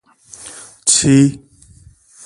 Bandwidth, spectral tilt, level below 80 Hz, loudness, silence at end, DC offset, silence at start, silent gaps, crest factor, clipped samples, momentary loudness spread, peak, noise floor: 11.5 kHz; -4 dB/octave; -48 dBFS; -13 LUFS; 0.9 s; under 0.1%; 0.45 s; none; 18 dB; under 0.1%; 23 LU; 0 dBFS; -46 dBFS